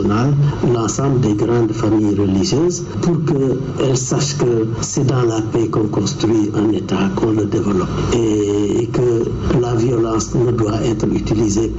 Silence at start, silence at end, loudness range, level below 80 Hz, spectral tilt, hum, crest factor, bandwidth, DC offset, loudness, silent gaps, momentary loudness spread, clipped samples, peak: 0 s; 0 s; 1 LU; -34 dBFS; -6.5 dB/octave; none; 8 dB; 8.2 kHz; 0.2%; -17 LUFS; none; 3 LU; under 0.1%; -8 dBFS